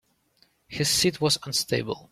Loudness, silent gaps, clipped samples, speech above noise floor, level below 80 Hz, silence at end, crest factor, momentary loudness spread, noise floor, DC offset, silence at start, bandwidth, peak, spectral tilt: -24 LUFS; none; under 0.1%; 40 dB; -56 dBFS; 0.1 s; 18 dB; 7 LU; -65 dBFS; under 0.1%; 0.7 s; 16 kHz; -10 dBFS; -3 dB/octave